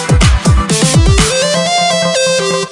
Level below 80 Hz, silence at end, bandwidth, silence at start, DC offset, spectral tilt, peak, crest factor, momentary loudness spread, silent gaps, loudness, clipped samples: -16 dBFS; 0 s; 11.5 kHz; 0 s; under 0.1%; -4 dB/octave; 0 dBFS; 10 dB; 3 LU; none; -10 LUFS; under 0.1%